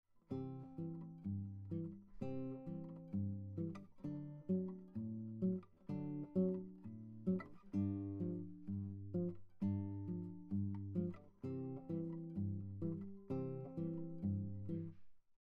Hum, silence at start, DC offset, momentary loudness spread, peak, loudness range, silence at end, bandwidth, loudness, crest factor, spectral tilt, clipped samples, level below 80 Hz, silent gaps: none; 0.15 s; under 0.1%; 8 LU; -28 dBFS; 4 LU; 0.05 s; 4.1 kHz; -45 LUFS; 16 dB; -11.5 dB/octave; under 0.1%; -72 dBFS; none